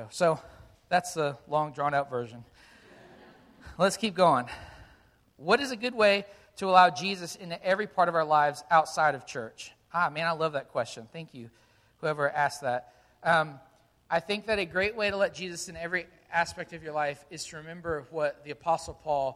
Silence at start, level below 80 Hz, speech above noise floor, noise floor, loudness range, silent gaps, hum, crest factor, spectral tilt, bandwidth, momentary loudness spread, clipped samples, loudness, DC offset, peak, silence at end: 0 s; -62 dBFS; 33 dB; -61 dBFS; 7 LU; none; none; 24 dB; -4 dB/octave; 14.5 kHz; 15 LU; under 0.1%; -28 LUFS; under 0.1%; -6 dBFS; 0 s